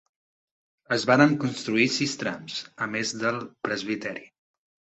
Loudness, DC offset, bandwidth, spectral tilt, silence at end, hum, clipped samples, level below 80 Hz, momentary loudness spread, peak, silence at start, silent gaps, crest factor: -25 LUFS; under 0.1%; 8.4 kHz; -4.5 dB/octave; 0.7 s; none; under 0.1%; -68 dBFS; 13 LU; -4 dBFS; 0.9 s; none; 24 dB